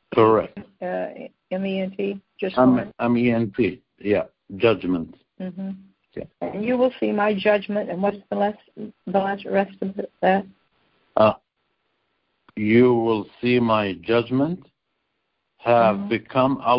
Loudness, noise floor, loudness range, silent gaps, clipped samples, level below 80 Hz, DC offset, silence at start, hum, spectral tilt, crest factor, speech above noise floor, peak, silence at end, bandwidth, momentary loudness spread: -22 LUFS; -75 dBFS; 3 LU; none; under 0.1%; -56 dBFS; under 0.1%; 0.1 s; none; -11.5 dB/octave; 20 dB; 54 dB; -4 dBFS; 0 s; 5.6 kHz; 17 LU